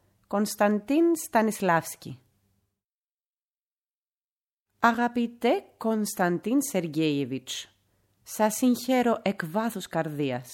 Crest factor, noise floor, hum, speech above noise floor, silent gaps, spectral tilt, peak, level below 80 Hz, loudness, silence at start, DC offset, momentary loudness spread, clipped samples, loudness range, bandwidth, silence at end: 22 dB; under -90 dBFS; none; over 64 dB; 2.85-2.89 s, 2.95-3.08 s, 3.14-3.18 s, 3.45-3.49 s, 3.63-3.82 s, 3.98-4.06 s, 4.17-4.36 s, 4.53-4.66 s; -5 dB/octave; -4 dBFS; -70 dBFS; -26 LUFS; 0.3 s; under 0.1%; 9 LU; under 0.1%; 5 LU; 17 kHz; 0 s